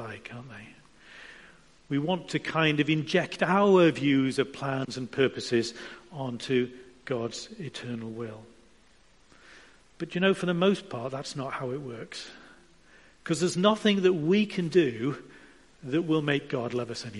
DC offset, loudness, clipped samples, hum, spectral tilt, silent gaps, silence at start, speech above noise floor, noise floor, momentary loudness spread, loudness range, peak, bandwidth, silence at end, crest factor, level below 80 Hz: under 0.1%; -27 LUFS; under 0.1%; none; -5.5 dB/octave; none; 0 s; 34 dB; -61 dBFS; 19 LU; 9 LU; -8 dBFS; 11.5 kHz; 0 s; 20 dB; -66 dBFS